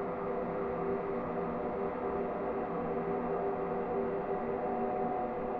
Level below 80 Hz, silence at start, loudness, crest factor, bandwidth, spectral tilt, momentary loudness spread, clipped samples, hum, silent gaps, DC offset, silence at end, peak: -58 dBFS; 0 s; -35 LUFS; 12 dB; 4.9 kHz; -7.5 dB/octave; 2 LU; under 0.1%; none; none; under 0.1%; 0 s; -22 dBFS